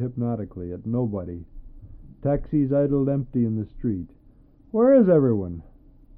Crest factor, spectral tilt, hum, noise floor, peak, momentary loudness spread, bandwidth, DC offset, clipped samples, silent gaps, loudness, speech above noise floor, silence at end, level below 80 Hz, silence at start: 16 dB; -14 dB/octave; none; -52 dBFS; -8 dBFS; 17 LU; 3.4 kHz; under 0.1%; under 0.1%; none; -23 LUFS; 30 dB; 0.55 s; -44 dBFS; 0 s